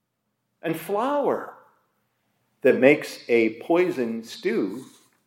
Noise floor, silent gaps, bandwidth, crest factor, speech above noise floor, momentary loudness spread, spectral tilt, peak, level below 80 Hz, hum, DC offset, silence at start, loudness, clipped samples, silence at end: -77 dBFS; none; 16.5 kHz; 22 dB; 54 dB; 13 LU; -5.5 dB/octave; -2 dBFS; -82 dBFS; none; under 0.1%; 0.65 s; -23 LUFS; under 0.1%; 0.4 s